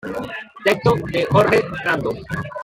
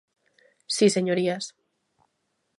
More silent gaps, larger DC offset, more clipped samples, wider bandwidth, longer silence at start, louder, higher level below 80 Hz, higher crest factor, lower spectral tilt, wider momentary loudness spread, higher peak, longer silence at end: neither; neither; neither; first, 16.5 kHz vs 11.5 kHz; second, 0.05 s vs 0.7 s; first, -19 LUFS vs -24 LUFS; first, -46 dBFS vs -78 dBFS; about the same, 18 dB vs 20 dB; first, -6 dB/octave vs -4.5 dB/octave; about the same, 13 LU vs 12 LU; first, -2 dBFS vs -8 dBFS; second, 0 s vs 1.1 s